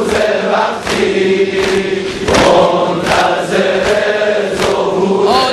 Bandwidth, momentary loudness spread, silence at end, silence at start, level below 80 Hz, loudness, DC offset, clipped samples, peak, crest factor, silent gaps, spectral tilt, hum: 12.5 kHz; 5 LU; 0 s; 0 s; -38 dBFS; -12 LUFS; under 0.1%; under 0.1%; 0 dBFS; 12 dB; none; -4.5 dB/octave; none